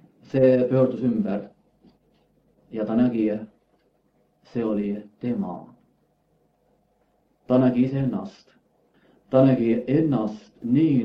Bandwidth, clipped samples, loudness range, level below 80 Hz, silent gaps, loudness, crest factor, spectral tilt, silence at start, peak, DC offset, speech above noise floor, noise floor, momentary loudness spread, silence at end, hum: 5.8 kHz; under 0.1%; 9 LU; -62 dBFS; none; -23 LUFS; 20 dB; -10 dB/octave; 0.35 s; -6 dBFS; under 0.1%; 45 dB; -66 dBFS; 15 LU; 0 s; none